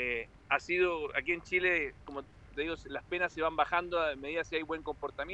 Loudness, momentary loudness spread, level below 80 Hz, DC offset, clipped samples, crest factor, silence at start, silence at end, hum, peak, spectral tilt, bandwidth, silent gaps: -33 LUFS; 11 LU; -56 dBFS; under 0.1%; under 0.1%; 20 dB; 0 s; 0 s; none; -14 dBFS; -4.5 dB/octave; 8.2 kHz; none